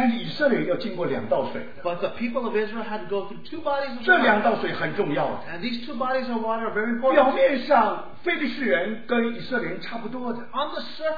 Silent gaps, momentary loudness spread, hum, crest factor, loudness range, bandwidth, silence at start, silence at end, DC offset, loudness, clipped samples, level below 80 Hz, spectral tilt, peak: none; 12 LU; none; 20 dB; 4 LU; 5 kHz; 0 s; 0 s; 2%; -24 LUFS; under 0.1%; -64 dBFS; -7.5 dB/octave; -4 dBFS